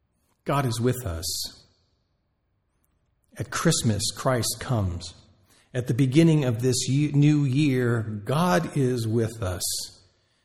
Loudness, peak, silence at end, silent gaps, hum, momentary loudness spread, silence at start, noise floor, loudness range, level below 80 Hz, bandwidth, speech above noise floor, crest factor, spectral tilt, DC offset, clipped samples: -24 LUFS; -6 dBFS; 0.55 s; none; none; 11 LU; 0.45 s; -73 dBFS; 8 LU; -52 dBFS; 17 kHz; 49 dB; 18 dB; -5.5 dB/octave; under 0.1%; under 0.1%